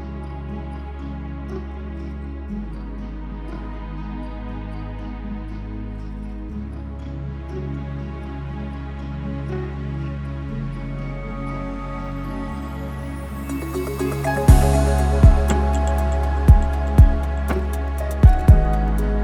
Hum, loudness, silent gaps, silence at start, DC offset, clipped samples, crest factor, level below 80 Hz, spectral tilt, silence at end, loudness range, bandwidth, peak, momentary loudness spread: none; -23 LUFS; none; 0 s; under 0.1%; under 0.1%; 20 dB; -22 dBFS; -7.5 dB/octave; 0 s; 14 LU; 15 kHz; 0 dBFS; 17 LU